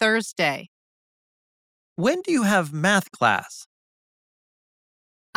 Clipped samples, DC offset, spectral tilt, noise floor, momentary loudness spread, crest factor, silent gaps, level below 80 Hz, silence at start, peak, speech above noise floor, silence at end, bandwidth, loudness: under 0.1%; under 0.1%; -4.5 dB/octave; under -90 dBFS; 17 LU; 22 dB; 0.68-1.96 s; -72 dBFS; 0 s; -4 dBFS; over 68 dB; 1.75 s; 17.5 kHz; -22 LUFS